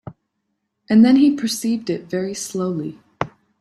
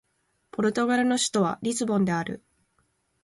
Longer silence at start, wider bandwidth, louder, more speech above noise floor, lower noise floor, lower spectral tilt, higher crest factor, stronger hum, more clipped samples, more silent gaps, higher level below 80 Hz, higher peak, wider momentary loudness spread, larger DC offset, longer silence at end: second, 0.05 s vs 0.55 s; first, 13.5 kHz vs 11.5 kHz; first, -19 LUFS vs -25 LUFS; first, 57 dB vs 47 dB; about the same, -74 dBFS vs -72 dBFS; about the same, -5.5 dB/octave vs -4.5 dB/octave; about the same, 18 dB vs 16 dB; neither; neither; neither; about the same, -60 dBFS vs -64 dBFS; first, -2 dBFS vs -12 dBFS; first, 16 LU vs 12 LU; neither; second, 0.3 s vs 0.85 s